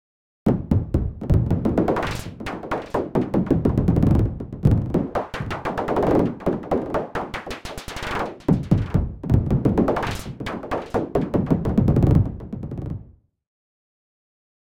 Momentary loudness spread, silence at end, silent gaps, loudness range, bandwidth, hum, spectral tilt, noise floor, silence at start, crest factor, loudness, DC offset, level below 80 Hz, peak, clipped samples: 12 LU; 1.6 s; none; 3 LU; 16.5 kHz; none; -8 dB/octave; -47 dBFS; 0.45 s; 20 dB; -23 LUFS; 0.2%; -32 dBFS; -2 dBFS; under 0.1%